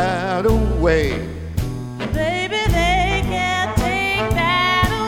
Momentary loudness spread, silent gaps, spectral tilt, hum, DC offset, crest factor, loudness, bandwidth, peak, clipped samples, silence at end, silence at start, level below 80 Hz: 9 LU; none; -5 dB/octave; none; under 0.1%; 16 dB; -19 LUFS; 17.5 kHz; -2 dBFS; under 0.1%; 0 s; 0 s; -26 dBFS